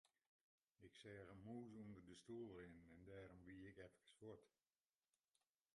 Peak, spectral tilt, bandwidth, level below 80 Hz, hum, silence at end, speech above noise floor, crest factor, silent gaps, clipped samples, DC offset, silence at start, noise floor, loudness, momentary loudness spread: -46 dBFS; -6.5 dB/octave; 11 kHz; -80 dBFS; none; 1.3 s; over 30 dB; 16 dB; 0.27-0.75 s; under 0.1%; under 0.1%; 0.05 s; under -90 dBFS; -61 LUFS; 8 LU